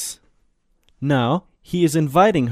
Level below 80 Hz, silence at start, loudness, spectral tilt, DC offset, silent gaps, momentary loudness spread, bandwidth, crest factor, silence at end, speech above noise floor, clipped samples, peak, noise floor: -52 dBFS; 0 s; -19 LUFS; -6 dB/octave; under 0.1%; none; 13 LU; 15.5 kHz; 16 dB; 0 s; 45 dB; under 0.1%; -4 dBFS; -62 dBFS